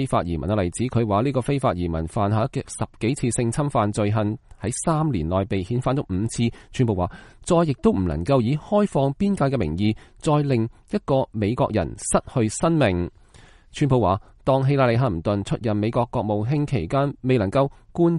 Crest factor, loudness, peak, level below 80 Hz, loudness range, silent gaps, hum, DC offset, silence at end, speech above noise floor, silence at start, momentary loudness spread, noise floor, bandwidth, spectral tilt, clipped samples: 18 dB; -23 LUFS; -4 dBFS; -42 dBFS; 2 LU; none; none; under 0.1%; 0 s; 28 dB; 0 s; 6 LU; -50 dBFS; 11.5 kHz; -6.5 dB/octave; under 0.1%